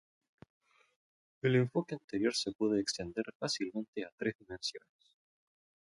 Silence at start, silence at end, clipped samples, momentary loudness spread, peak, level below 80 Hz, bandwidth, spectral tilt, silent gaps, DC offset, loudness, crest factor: 1.45 s; 1.15 s; under 0.1%; 9 LU; -18 dBFS; -70 dBFS; 11.5 kHz; -5 dB/octave; 2.04-2.08 s, 2.55-2.59 s, 3.35-3.40 s, 3.88-3.93 s, 4.12-4.18 s, 4.35-4.39 s; under 0.1%; -35 LUFS; 20 dB